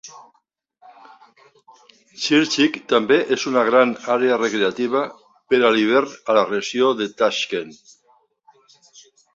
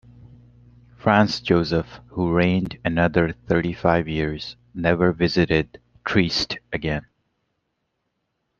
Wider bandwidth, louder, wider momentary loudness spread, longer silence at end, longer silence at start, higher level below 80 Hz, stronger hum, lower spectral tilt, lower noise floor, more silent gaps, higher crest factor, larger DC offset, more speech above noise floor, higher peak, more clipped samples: first, 8 kHz vs 7.2 kHz; first, -19 LUFS vs -22 LUFS; about the same, 8 LU vs 9 LU; about the same, 1.6 s vs 1.6 s; second, 0.05 s vs 1.05 s; second, -66 dBFS vs -46 dBFS; neither; second, -3.5 dB/octave vs -6.5 dB/octave; second, -60 dBFS vs -75 dBFS; neither; about the same, 18 dB vs 20 dB; neither; second, 41 dB vs 54 dB; about the same, -2 dBFS vs -2 dBFS; neither